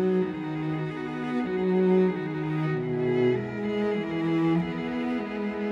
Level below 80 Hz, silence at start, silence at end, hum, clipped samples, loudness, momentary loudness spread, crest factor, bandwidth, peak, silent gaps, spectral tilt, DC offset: -60 dBFS; 0 s; 0 s; none; under 0.1%; -27 LUFS; 7 LU; 14 dB; 7.2 kHz; -12 dBFS; none; -9 dB/octave; under 0.1%